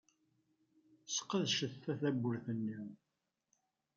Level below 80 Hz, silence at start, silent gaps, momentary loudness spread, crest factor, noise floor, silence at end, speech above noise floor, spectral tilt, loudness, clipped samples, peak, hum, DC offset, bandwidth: -86 dBFS; 1.05 s; none; 8 LU; 18 dB; -82 dBFS; 1 s; 44 dB; -4 dB/octave; -38 LUFS; under 0.1%; -24 dBFS; none; under 0.1%; 7.6 kHz